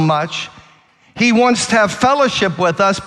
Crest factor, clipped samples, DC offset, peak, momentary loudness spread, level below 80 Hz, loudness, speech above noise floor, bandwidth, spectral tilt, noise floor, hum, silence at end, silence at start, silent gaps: 14 dB; under 0.1%; under 0.1%; 0 dBFS; 9 LU; -50 dBFS; -14 LUFS; 35 dB; 12 kHz; -4.5 dB/octave; -50 dBFS; none; 0 s; 0 s; none